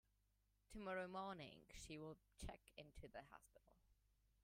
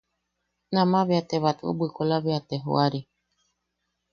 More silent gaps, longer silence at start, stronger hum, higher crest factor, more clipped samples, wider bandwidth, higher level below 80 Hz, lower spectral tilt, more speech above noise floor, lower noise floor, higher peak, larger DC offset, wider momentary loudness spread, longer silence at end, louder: neither; about the same, 0.7 s vs 0.7 s; first, 50 Hz at -85 dBFS vs none; about the same, 20 dB vs 20 dB; neither; first, 16 kHz vs 7 kHz; about the same, -68 dBFS vs -66 dBFS; second, -4.5 dB/octave vs -7.5 dB/octave; second, 28 dB vs 55 dB; first, -84 dBFS vs -79 dBFS; second, -38 dBFS vs -8 dBFS; neither; first, 13 LU vs 7 LU; second, 0.5 s vs 1.1 s; second, -56 LUFS vs -25 LUFS